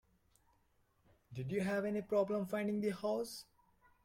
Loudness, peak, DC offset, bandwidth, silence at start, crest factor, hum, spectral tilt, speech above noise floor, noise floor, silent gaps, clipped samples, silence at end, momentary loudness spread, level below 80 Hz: -38 LUFS; -22 dBFS; under 0.1%; 16 kHz; 1.3 s; 18 dB; none; -6.5 dB/octave; 38 dB; -75 dBFS; none; under 0.1%; 0.6 s; 11 LU; -74 dBFS